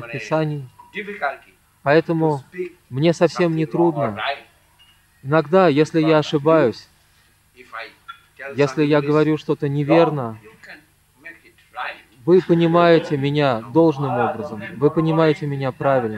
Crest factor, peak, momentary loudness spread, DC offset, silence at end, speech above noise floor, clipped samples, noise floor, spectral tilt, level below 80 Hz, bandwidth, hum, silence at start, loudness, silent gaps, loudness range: 18 dB; -2 dBFS; 16 LU; under 0.1%; 0 s; 39 dB; under 0.1%; -57 dBFS; -7.5 dB/octave; -60 dBFS; 12 kHz; none; 0 s; -18 LUFS; none; 4 LU